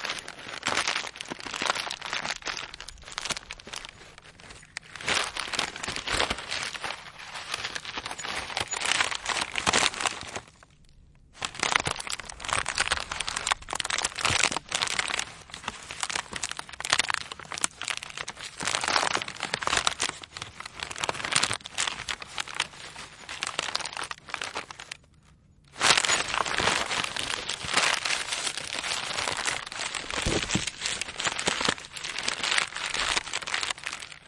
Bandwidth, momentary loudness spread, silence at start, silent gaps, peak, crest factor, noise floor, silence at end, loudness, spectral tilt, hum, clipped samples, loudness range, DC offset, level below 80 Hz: 11.5 kHz; 13 LU; 0 s; none; 0 dBFS; 30 dB; -58 dBFS; 0.05 s; -28 LUFS; -0.5 dB/octave; none; under 0.1%; 6 LU; under 0.1%; -54 dBFS